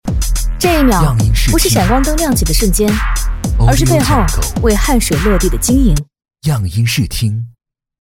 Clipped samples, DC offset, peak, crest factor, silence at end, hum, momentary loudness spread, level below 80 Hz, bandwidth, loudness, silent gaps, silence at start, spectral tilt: under 0.1%; under 0.1%; 0 dBFS; 12 dB; 0.65 s; none; 7 LU; -16 dBFS; 17 kHz; -13 LUFS; none; 0.05 s; -5 dB/octave